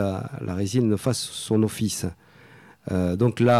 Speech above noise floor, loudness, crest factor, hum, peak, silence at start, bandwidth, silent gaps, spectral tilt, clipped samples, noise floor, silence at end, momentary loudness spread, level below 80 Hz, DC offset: 27 dB; -25 LUFS; 14 dB; none; -10 dBFS; 0 s; 15 kHz; none; -6 dB/octave; under 0.1%; -50 dBFS; 0 s; 9 LU; -54 dBFS; under 0.1%